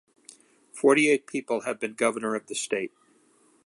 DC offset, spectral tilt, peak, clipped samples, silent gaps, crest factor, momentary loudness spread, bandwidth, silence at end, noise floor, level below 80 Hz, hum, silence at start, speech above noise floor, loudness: under 0.1%; -3.5 dB/octave; -8 dBFS; under 0.1%; none; 20 dB; 11 LU; 11.5 kHz; 0.8 s; -62 dBFS; -80 dBFS; none; 0.75 s; 37 dB; -26 LUFS